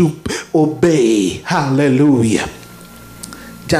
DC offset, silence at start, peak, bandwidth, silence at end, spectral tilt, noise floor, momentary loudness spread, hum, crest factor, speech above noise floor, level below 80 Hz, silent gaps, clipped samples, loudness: under 0.1%; 0 s; 0 dBFS; 15.5 kHz; 0 s; -6 dB/octave; -37 dBFS; 20 LU; none; 16 dB; 24 dB; -44 dBFS; none; under 0.1%; -14 LUFS